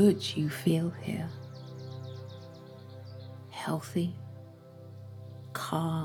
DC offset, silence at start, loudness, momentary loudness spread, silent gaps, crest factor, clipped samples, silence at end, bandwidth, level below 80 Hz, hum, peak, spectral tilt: under 0.1%; 0 s; -34 LUFS; 19 LU; none; 22 dB; under 0.1%; 0 s; 18.5 kHz; -74 dBFS; none; -12 dBFS; -6.5 dB/octave